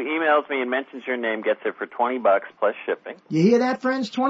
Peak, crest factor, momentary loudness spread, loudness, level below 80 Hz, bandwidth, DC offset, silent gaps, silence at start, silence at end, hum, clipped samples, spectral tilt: -6 dBFS; 16 dB; 10 LU; -23 LUFS; -78 dBFS; 8 kHz; under 0.1%; none; 0 s; 0 s; none; under 0.1%; -6.5 dB/octave